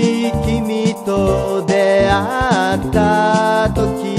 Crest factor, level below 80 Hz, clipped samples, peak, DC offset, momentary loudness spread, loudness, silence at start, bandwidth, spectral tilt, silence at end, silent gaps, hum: 14 dB; -30 dBFS; under 0.1%; 0 dBFS; under 0.1%; 5 LU; -15 LUFS; 0 s; 15 kHz; -6 dB/octave; 0 s; none; none